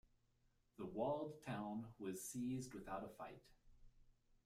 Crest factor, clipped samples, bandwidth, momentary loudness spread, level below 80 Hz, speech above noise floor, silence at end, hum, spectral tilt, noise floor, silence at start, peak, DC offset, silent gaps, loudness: 18 dB; under 0.1%; 15.5 kHz; 12 LU; -72 dBFS; 32 dB; 0.35 s; none; -5.5 dB/octave; -80 dBFS; 0.8 s; -30 dBFS; under 0.1%; none; -48 LUFS